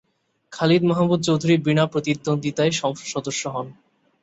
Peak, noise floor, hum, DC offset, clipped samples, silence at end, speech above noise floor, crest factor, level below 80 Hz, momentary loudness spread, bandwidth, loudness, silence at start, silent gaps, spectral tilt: -4 dBFS; -56 dBFS; none; under 0.1%; under 0.1%; 0.5 s; 36 dB; 18 dB; -60 dBFS; 11 LU; 8.2 kHz; -21 LUFS; 0.5 s; none; -5.5 dB/octave